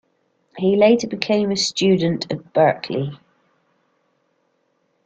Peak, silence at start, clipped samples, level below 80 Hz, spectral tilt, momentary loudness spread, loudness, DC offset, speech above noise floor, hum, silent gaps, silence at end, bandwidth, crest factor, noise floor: 0 dBFS; 0.55 s; under 0.1%; -60 dBFS; -5 dB/octave; 10 LU; -19 LUFS; under 0.1%; 49 dB; none; none; 1.9 s; 9.2 kHz; 20 dB; -67 dBFS